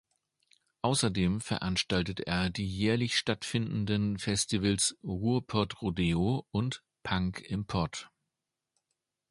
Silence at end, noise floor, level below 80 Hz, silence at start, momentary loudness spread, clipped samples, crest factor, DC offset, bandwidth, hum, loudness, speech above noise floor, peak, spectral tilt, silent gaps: 1.25 s; -87 dBFS; -50 dBFS; 0.85 s; 6 LU; under 0.1%; 20 dB; under 0.1%; 11.5 kHz; none; -31 LUFS; 57 dB; -12 dBFS; -4.5 dB/octave; none